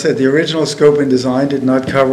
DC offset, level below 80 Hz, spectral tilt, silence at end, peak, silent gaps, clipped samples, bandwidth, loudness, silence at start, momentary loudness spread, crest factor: under 0.1%; -52 dBFS; -5.5 dB/octave; 0 s; 0 dBFS; none; 0.2%; 12 kHz; -13 LUFS; 0 s; 4 LU; 12 dB